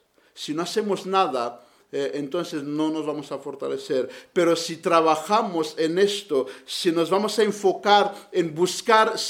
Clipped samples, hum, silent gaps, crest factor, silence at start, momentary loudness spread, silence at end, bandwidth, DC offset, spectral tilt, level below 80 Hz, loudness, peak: under 0.1%; none; none; 20 dB; 0.35 s; 11 LU; 0 s; 16.5 kHz; under 0.1%; -4 dB/octave; -76 dBFS; -23 LUFS; -4 dBFS